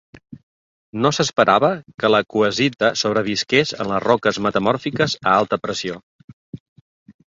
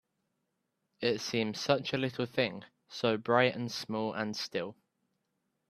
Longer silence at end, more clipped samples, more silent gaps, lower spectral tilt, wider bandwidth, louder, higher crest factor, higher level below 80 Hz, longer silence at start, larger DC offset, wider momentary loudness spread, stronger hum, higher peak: second, 0.25 s vs 1 s; neither; first, 0.43-0.93 s, 1.94-1.98 s, 6.03-6.53 s, 6.60-7.06 s vs none; about the same, -4.5 dB/octave vs -4.5 dB/octave; second, 7.8 kHz vs 14 kHz; first, -19 LUFS vs -32 LUFS; second, 18 dB vs 24 dB; first, -56 dBFS vs -74 dBFS; second, 0.15 s vs 1 s; neither; about the same, 8 LU vs 10 LU; neither; first, -2 dBFS vs -12 dBFS